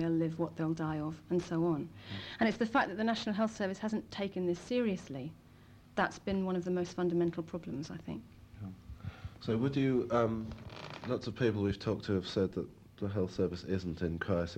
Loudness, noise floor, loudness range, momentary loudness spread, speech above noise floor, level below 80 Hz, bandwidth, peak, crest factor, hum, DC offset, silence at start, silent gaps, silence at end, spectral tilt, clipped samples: -35 LUFS; -58 dBFS; 2 LU; 14 LU; 24 dB; -58 dBFS; 10 kHz; -18 dBFS; 18 dB; none; under 0.1%; 0 s; none; 0 s; -7 dB/octave; under 0.1%